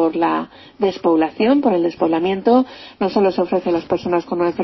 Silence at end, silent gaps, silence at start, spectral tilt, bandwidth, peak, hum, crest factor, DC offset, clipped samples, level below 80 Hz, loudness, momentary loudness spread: 0 s; none; 0 s; -7.5 dB/octave; 6 kHz; -2 dBFS; none; 14 dB; under 0.1%; under 0.1%; -54 dBFS; -18 LUFS; 6 LU